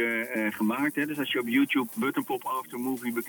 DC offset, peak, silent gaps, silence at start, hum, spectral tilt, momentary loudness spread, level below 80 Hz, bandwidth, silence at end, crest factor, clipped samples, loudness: under 0.1%; -12 dBFS; none; 0 s; none; -4.5 dB/octave; 7 LU; -80 dBFS; 19 kHz; 0 s; 16 dB; under 0.1%; -28 LUFS